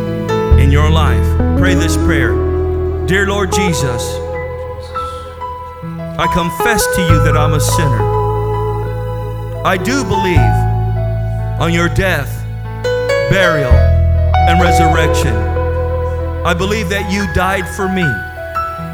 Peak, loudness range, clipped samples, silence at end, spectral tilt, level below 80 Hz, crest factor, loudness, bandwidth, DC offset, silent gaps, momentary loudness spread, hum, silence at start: 0 dBFS; 5 LU; under 0.1%; 0 s; -5.5 dB/octave; -20 dBFS; 14 dB; -14 LUFS; 18.5 kHz; under 0.1%; none; 12 LU; none; 0 s